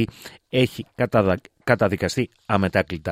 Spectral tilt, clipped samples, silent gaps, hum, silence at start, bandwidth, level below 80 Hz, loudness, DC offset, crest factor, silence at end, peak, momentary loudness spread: -6 dB/octave; under 0.1%; none; none; 0 s; 16 kHz; -52 dBFS; -22 LUFS; under 0.1%; 20 dB; 0 s; -2 dBFS; 7 LU